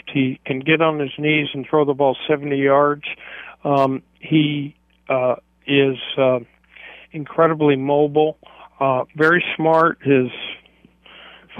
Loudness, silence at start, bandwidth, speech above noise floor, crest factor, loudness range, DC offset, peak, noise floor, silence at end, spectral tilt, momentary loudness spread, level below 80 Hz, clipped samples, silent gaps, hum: -18 LUFS; 0.05 s; 5.8 kHz; 33 dB; 16 dB; 3 LU; under 0.1%; -4 dBFS; -51 dBFS; 0 s; -8 dB/octave; 14 LU; -62 dBFS; under 0.1%; none; none